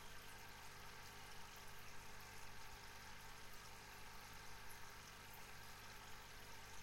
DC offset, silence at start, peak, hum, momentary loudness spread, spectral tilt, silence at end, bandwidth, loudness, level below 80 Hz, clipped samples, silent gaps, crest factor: under 0.1%; 0 s; -42 dBFS; 50 Hz at -65 dBFS; 1 LU; -2 dB/octave; 0 s; 16.5 kHz; -57 LUFS; -66 dBFS; under 0.1%; none; 14 dB